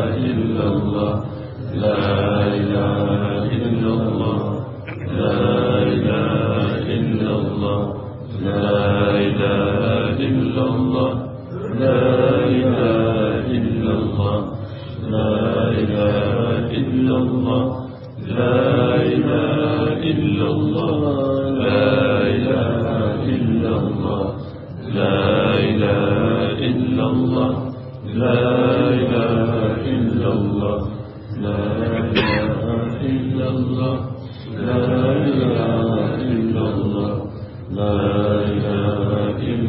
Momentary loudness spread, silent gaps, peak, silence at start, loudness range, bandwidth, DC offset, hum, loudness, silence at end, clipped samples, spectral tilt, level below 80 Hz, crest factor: 9 LU; none; -2 dBFS; 0 s; 2 LU; 5.6 kHz; under 0.1%; none; -19 LUFS; 0 s; under 0.1%; -10.5 dB/octave; -46 dBFS; 16 dB